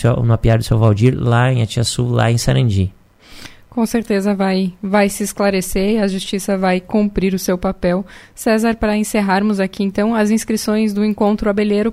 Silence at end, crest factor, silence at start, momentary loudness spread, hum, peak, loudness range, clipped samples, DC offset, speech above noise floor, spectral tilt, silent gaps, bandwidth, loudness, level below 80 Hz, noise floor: 0 s; 16 dB; 0 s; 5 LU; none; 0 dBFS; 2 LU; under 0.1%; under 0.1%; 23 dB; -6 dB/octave; none; 15.5 kHz; -16 LUFS; -34 dBFS; -38 dBFS